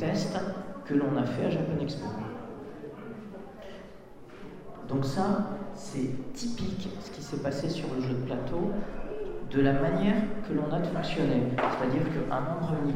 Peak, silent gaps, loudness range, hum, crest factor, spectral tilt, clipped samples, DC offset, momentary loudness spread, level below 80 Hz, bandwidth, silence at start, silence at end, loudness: -12 dBFS; none; 7 LU; none; 18 dB; -7 dB/octave; under 0.1%; 0.2%; 17 LU; -46 dBFS; 14 kHz; 0 s; 0 s; -31 LUFS